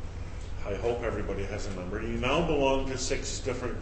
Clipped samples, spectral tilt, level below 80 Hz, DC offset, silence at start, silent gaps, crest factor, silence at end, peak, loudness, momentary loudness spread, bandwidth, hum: under 0.1%; -4.5 dB/octave; -38 dBFS; under 0.1%; 0 s; none; 16 dB; 0 s; -14 dBFS; -31 LUFS; 12 LU; 8.8 kHz; none